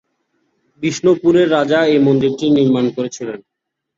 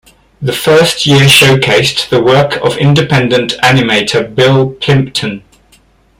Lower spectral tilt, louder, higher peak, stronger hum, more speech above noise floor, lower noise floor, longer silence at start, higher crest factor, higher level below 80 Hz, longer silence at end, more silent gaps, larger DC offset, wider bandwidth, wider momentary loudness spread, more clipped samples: first, -6 dB/octave vs -4.5 dB/octave; second, -14 LUFS vs -8 LUFS; about the same, -2 dBFS vs 0 dBFS; neither; first, 52 dB vs 38 dB; first, -66 dBFS vs -47 dBFS; first, 0.8 s vs 0.4 s; about the same, 14 dB vs 10 dB; second, -56 dBFS vs -42 dBFS; second, 0.6 s vs 0.8 s; neither; neither; second, 7.8 kHz vs 17 kHz; about the same, 12 LU vs 10 LU; second, under 0.1% vs 0.2%